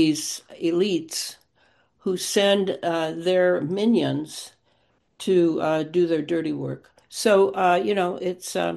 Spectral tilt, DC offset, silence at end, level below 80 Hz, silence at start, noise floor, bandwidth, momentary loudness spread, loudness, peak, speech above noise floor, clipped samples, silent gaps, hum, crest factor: -4.5 dB/octave; under 0.1%; 0 s; -70 dBFS; 0 s; -66 dBFS; 12.5 kHz; 13 LU; -23 LUFS; -6 dBFS; 44 dB; under 0.1%; none; none; 18 dB